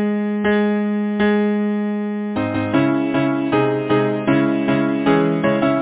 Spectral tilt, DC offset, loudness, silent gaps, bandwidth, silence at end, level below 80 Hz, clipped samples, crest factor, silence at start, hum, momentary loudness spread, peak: -11 dB/octave; under 0.1%; -18 LUFS; none; 4 kHz; 0 s; -52 dBFS; under 0.1%; 16 dB; 0 s; none; 5 LU; -2 dBFS